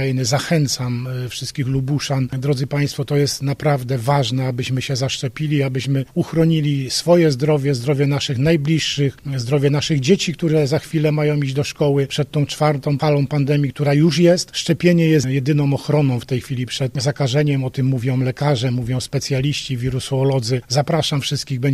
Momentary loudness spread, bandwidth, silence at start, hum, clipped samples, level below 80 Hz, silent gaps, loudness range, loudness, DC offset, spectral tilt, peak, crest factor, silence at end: 6 LU; 13.5 kHz; 0 s; none; under 0.1%; -48 dBFS; none; 3 LU; -19 LUFS; under 0.1%; -6 dB/octave; -2 dBFS; 16 dB; 0 s